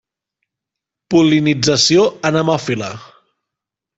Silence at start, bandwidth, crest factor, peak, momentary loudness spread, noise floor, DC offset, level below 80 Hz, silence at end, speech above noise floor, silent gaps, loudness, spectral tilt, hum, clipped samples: 1.1 s; 8.2 kHz; 16 dB; -2 dBFS; 11 LU; -83 dBFS; under 0.1%; -54 dBFS; 0.95 s; 69 dB; none; -14 LUFS; -4.5 dB/octave; none; under 0.1%